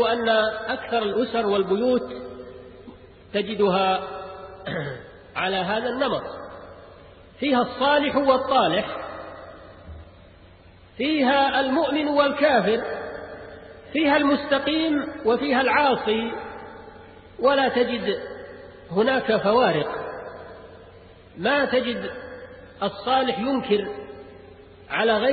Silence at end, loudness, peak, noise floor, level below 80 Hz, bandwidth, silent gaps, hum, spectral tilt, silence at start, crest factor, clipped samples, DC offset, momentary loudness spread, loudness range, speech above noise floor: 0 s; -23 LUFS; -6 dBFS; -49 dBFS; -54 dBFS; 4.8 kHz; none; none; -9.5 dB/octave; 0 s; 18 dB; under 0.1%; under 0.1%; 22 LU; 5 LU; 28 dB